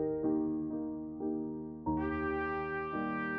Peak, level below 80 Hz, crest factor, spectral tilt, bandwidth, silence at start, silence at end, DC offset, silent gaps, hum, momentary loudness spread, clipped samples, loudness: -22 dBFS; -54 dBFS; 14 dB; -10 dB/octave; 5 kHz; 0 s; 0 s; under 0.1%; none; none; 6 LU; under 0.1%; -36 LUFS